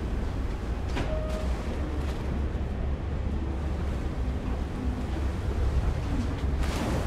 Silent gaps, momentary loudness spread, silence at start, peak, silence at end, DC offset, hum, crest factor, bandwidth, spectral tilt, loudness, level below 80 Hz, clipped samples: none; 3 LU; 0 s; -16 dBFS; 0 s; under 0.1%; none; 14 dB; 12 kHz; -7 dB/octave; -31 LUFS; -30 dBFS; under 0.1%